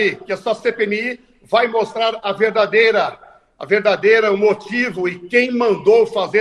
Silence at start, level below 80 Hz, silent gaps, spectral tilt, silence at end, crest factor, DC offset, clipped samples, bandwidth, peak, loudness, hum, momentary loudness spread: 0 s; -60 dBFS; none; -5 dB/octave; 0 s; 16 dB; under 0.1%; under 0.1%; 10.5 kHz; 0 dBFS; -16 LUFS; none; 9 LU